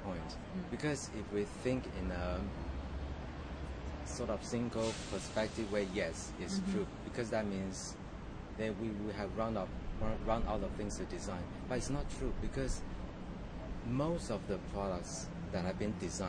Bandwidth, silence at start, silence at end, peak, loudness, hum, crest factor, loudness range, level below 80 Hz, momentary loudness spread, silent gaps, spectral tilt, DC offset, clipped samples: 10 kHz; 0 s; 0 s; -20 dBFS; -40 LUFS; none; 18 dB; 2 LU; -46 dBFS; 8 LU; none; -5.5 dB/octave; under 0.1%; under 0.1%